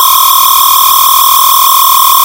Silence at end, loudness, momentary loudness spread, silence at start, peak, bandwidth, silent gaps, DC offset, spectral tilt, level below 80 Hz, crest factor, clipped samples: 0 s; -3 LUFS; 0 LU; 0 s; 0 dBFS; over 20 kHz; none; under 0.1%; 3 dB/octave; -44 dBFS; 6 dB; 8%